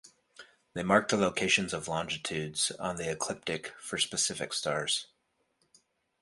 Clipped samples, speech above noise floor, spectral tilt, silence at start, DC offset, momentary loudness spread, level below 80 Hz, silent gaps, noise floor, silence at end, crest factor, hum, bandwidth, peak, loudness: under 0.1%; 44 dB; -2.5 dB/octave; 0.05 s; under 0.1%; 9 LU; -64 dBFS; none; -76 dBFS; 1.15 s; 22 dB; none; 11.5 kHz; -10 dBFS; -30 LUFS